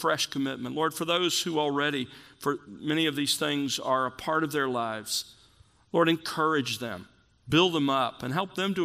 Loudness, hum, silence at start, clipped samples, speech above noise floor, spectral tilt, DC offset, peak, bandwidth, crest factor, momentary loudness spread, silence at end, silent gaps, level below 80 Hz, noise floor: -28 LUFS; none; 0 s; under 0.1%; 32 dB; -3.5 dB/octave; under 0.1%; -8 dBFS; 15.5 kHz; 20 dB; 8 LU; 0 s; none; -66 dBFS; -60 dBFS